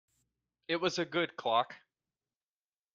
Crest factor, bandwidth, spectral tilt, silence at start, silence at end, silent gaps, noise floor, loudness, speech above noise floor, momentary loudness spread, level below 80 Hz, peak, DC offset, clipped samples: 22 dB; 7.8 kHz; -4 dB/octave; 0.7 s; 1.2 s; none; under -90 dBFS; -33 LUFS; over 57 dB; 9 LU; -80 dBFS; -16 dBFS; under 0.1%; under 0.1%